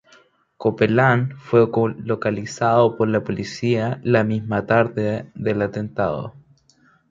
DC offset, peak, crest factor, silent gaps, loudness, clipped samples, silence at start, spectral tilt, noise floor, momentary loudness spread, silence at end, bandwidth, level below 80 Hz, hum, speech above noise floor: under 0.1%; -2 dBFS; 18 dB; none; -20 LUFS; under 0.1%; 0.6 s; -7 dB/octave; -58 dBFS; 8 LU; 0.7 s; 7.6 kHz; -54 dBFS; none; 38 dB